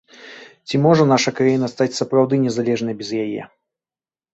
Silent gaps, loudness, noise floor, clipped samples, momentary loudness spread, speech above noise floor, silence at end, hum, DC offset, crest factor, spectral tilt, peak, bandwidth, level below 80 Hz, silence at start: none; -18 LUFS; under -90 dBFS; under 0.1%; 16 LU; over 72 dB; 0.9 s; none; under 0.1%; 18 dB; -6 dB/octave; -2 dBFS; 8.2 kHz; -60 dBFS; 0.2 s